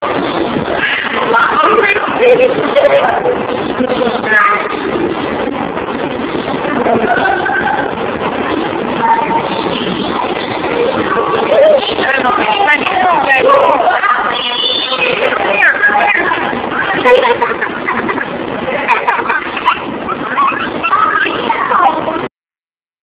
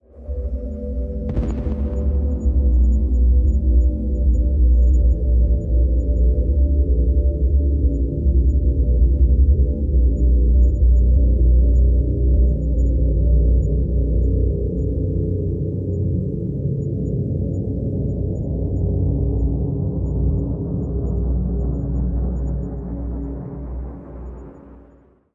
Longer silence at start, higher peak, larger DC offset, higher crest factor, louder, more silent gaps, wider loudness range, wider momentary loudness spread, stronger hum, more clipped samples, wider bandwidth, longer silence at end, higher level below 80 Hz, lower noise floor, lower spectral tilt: second, 0 s vs 0.15 s; first, 0 dBFS vs -6 dBFS; neither; about the same, 12 dB vs 12 dB; first, -12 LUFS vs -20 LUFS; neither; about the same, 5 LU vs 6 LU; second, 8 LU vs 11 LU; neither; first, 0.2% vs under 0.1%; first, 4 kHz vs 1.2 kHz; first, 0.75 s vs 0.55 s; second, -44 dBFS vs -18 dBFS; first, under -90 dBFS vs -51 dBFS; second, -8 dB/octave vs -12.5 dB/octave